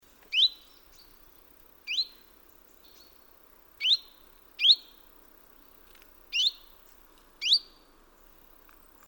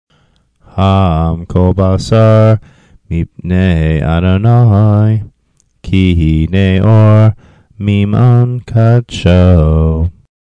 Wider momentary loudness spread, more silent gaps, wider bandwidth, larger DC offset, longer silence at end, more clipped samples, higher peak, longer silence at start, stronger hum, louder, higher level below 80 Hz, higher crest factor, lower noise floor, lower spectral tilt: about the same, 12 LU vs 10 LU; neither; first, over 20 kHz vs 8.2 kHz; neither; first, 1.45 s vs 0.4 s; second, under 0.1% vs 1%; second, -10 dBFS vs 0 dBFS; second, 0.3 s vs 0.75 s; neither; second, -25 LUFS vs -10 LUFS; second, -64 dBFS vs -24 dBFS; first, 24 dB vs 10 dB; about the same, -58 dBFS vs -56 dBFS; second, 2.5 dB/octave vs -8.5 dB/octave